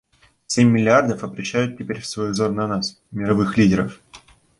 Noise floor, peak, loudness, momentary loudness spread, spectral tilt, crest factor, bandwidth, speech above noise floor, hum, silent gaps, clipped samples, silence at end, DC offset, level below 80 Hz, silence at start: -48 dBFS; -2 dBFS; -20 LUFS; 12 LU; -5.5 dB/octave; 18 dB; 11.5 kHz; 29 dB; none; none; under 0.1%; 0.4 s; under 0.1%; -50 dBFS; 0.5 s